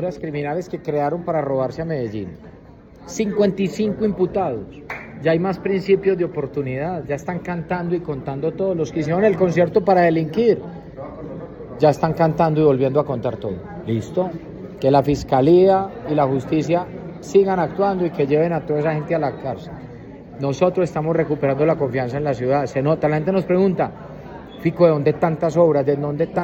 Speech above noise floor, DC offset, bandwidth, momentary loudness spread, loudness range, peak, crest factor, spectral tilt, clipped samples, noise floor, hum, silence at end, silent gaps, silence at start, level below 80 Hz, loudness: 24 dB; under 0.1%; 8.2 kHz; 16 LU; 5 LU; -2 dBFS; 18 dB; -8 dB/octave; under 0.1%; -43 dBFS; none; 0 s; none; 0 s; -48 dBFS; -20 LUFS